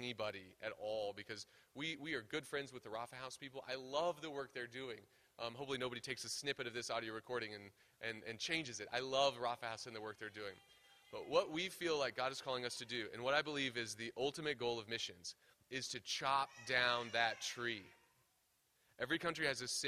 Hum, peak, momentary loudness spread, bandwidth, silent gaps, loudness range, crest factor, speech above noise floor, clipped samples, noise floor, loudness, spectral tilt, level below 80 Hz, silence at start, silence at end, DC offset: none; -20 dBFS; 12 LU; 15 kHz; none; 5 LU; 24 dB; 36 dB; under 0.1%; -79 dBFS; -42 LUFS; -2.5 dB/octave; -78 dBFS; 0 s; 0 s; under 0.1%